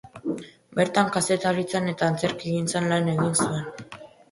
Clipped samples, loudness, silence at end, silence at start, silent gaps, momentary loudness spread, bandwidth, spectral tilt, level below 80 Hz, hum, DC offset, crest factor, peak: under 0.1%; -25 LUFS; 0.25 s; 0.05 s; none; 13 LU; 11.5 kHz; -4.5 dB/octave; -62 dBFS; none; under 0.1%; 20 dB; -6 dBFS